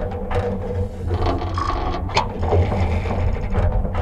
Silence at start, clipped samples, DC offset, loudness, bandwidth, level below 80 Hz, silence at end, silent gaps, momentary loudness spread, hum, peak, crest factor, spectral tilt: 0 s; under 0.1%; under 0.1%; -22 LUFS; 8.2 kHz; -26 dBFS; 0 s; none; 5 LU; none; -2 dBFS; 18 dB; -7 dB/octave